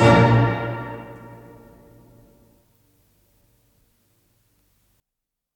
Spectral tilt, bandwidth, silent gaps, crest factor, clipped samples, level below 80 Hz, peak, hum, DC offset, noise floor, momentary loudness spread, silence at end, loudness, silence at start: -7.5 dB/octave; 9.4 kHz; none; 20 dB; under 0.1%; -46 dBFS; -4 dBFS; none; under 0.1%; -84 dBFS; 28 LU; 4.4 s; -19 LUFS; 0 s